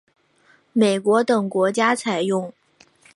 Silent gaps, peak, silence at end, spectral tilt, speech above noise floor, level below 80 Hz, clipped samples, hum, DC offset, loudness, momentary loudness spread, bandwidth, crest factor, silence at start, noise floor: none; -4 dBFS; 0.65 s; -5 dB/octave; 39 dB; -74 dBFS; under 0.1%; none; under 0.1%; -20 LUFS; 8 LU; 11.5 kHz; 18 dB; 0.75 s; -58 dBFS